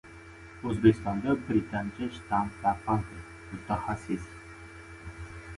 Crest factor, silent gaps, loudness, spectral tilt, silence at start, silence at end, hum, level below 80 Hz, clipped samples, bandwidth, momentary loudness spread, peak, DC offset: 24 dB; none; -30 LUFS; -7.5 dB/octave; 0.05 s; 0 s; none; -50 dBFS; under 0.1%; 11.5 kHz; 22 LU; -8 dBFS; under 0.1%